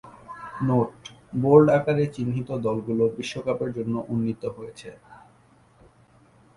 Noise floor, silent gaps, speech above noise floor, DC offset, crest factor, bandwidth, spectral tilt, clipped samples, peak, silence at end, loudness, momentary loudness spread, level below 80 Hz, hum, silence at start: -57 dBFS; none; 34 dB; under 0.1%; 22 dB; 11 kHz; -8 dB/octave; under 0.1%; -2 dBFS; 1.4 s; -24 LUFS; 23 LU; -58 dBFS; none; 0.05 s